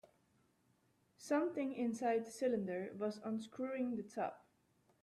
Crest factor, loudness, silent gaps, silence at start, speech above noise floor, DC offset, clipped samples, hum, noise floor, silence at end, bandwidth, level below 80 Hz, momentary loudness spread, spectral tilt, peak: 16 dB; -41 LUFS; none; 1.2 s; 37 dB; under 0.1%; under 0.1%; none; -77 dBFS; 0.65 s; 13.5 kHz; -84 dBFS; 7 LU; -6 dB/octave; -26 dBFS